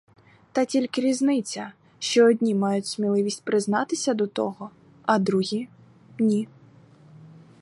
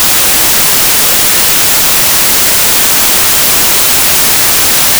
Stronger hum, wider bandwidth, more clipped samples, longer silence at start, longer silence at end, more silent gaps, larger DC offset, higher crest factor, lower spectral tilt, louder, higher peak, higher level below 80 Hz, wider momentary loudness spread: neither; second, 11.5 kHz vs over 20 kHz; neither; first, 0.55 s vs 0 s; first, 0.35 s vs 0 s; neither; neither; first, 18 dB vs 4 dB; first, -5 dB/octave vs 0 dB/octave; second, -24 LUFS vs -4 LUFS; second, -6 dBFS vs -2 dBFS; second, -74 dBFS vs -32 dBFS; first, 14 LU vs 0 LU